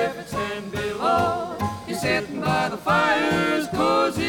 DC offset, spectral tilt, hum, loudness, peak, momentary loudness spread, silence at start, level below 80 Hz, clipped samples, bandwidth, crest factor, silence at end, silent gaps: under 0.1%; -5 dB/octave; none; -23 LUFS; -8 dBFS; 9 LU; 0 s; -50 dBFS; under 0.1%; 19.5 kHz; 16 dB; 0 s; none